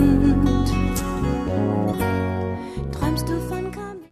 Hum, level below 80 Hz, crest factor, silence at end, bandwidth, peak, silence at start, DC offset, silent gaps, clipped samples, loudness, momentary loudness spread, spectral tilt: none; -30 dBFS; 16 dB; 0.05 s; 14 kHz; -4 dBFS; 0 s; under 0.1%; none; under 0.1%; -23 LUFS; 11 LU; -7 dB/octave